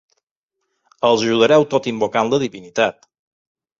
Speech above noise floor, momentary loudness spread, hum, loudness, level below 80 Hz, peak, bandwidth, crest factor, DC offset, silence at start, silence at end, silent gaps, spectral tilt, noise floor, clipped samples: 61 dB; 7 LU; none; -17 LUFS; -62 dBFS; -2 dBFS; 7.6 kHz; 18 dB; under 0.1%; 1 s; 0.9 s; none; -4.5 dB/octave; -78 dBFS; under 0.1%